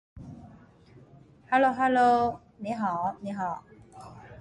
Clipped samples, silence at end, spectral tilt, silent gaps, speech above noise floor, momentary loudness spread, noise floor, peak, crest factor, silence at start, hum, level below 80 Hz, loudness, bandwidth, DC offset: under 0.1%; 0.05 s; -6.5 dB/octave; none; 29 dB; 25 LU; -54 dBFS; -10 dBFS; 18 dB; 0.15 s; none; -60 dBFS; -26 LUFS; 9.6 kHz; under 0.1%